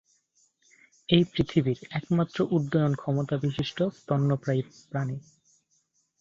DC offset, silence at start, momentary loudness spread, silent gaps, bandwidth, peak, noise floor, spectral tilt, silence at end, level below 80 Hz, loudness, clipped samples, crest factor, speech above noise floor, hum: under 0.1%; 1.1 s; 9 LU; none; 7.6 kHz; -6 dBFS; -72 dBFS; -7.5 dB/octave; 1 s; -56 dBFS; -27 LUFS; under 0.1%; 22 dB; 45 dB; none